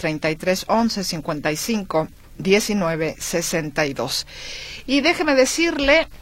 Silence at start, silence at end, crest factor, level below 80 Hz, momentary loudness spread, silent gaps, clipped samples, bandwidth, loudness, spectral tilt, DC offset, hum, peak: 0 s; 0.05 s; 18 dB; -42 dBFS; 9 LU; none; under 0.1%; 16.5 kHz; -20 LUFS; -3.5 dB/octave; under 0.1%; none; -2 dBFS